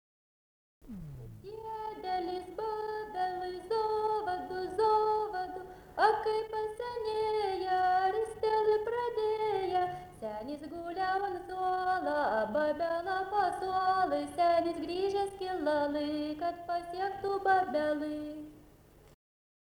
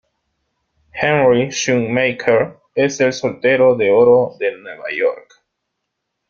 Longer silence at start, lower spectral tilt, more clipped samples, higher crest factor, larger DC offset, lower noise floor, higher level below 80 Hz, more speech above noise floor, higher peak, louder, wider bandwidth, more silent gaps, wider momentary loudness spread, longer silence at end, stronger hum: about the same, 0.85 s vs 0.95 s; about the same, -5.5 dB/octave vs -5 dB/octave; neither; about the same, 20 dB vs 16 dB; neither; second, -59 dBFS vs -76 dBFS; second, -62 dBFS vs -56 dBFS; second, 26 dB vs 61 dB; second, -14 dBFS vs 0 dBFS; second, -33 LUFS vs -16 LUFS; first, over 20 kHz vs 7.4 kHz; neither; about the same, 13 LU vs 11 LU; about the same, 1.05 s vs 1.1 s; neither